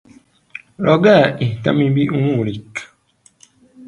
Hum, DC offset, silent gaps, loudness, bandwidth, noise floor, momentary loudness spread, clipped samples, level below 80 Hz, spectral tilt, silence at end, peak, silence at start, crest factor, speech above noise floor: none; under 0.1%; none; -15 LUFS; 10.5 kHz; -55 dBFS; 22 LU; under 0.1%; -54 dBFS; -7.5 dB/octave; 0 s; 0 dBFS; 0.55 s; 18 dB; 40 dB